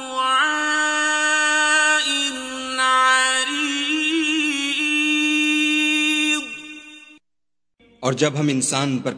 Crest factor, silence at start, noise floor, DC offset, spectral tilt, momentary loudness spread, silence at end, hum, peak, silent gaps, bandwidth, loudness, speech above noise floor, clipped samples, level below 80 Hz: 18 dB; 0 s; -88 dBFS; under 0.1%; -2 dB/octave; 9 LU; 0 s; none; -2 dBFS; none; 11 kHz; -18 LUFS; 67 dB; under 0.1%; -64 dBFS